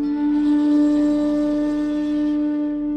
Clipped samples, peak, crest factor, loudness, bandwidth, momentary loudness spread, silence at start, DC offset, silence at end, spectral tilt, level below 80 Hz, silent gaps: under 0.1%; -10 dBFS; 8 dB; -20 LUFS; 8 kHz; 5 LU; 0 s; under 0.1%; 0 s; -7 dB/octave; -46 dBFS; none